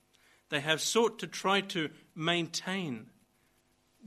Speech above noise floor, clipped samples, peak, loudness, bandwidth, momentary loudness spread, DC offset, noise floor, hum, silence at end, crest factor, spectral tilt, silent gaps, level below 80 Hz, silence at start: 39 dB; under 0.1%; -12 dBFS; -32 LUFS; 13 kHz; 9 LU; under 0.1%; -71 dBFS; none; 0 s; 24 dB; -3 dB/octave; none; -78 dBFS; 0.5 s